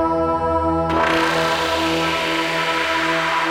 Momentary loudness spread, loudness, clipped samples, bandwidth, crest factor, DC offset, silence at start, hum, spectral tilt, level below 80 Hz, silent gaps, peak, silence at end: 2 LU; -18 LUFS; under 0.1%; 16.5 kHz; 16 dB; 0.2%; 0 s; none; -4 dB/octave; -40 dBFS; none; -4 dBFS; 0 s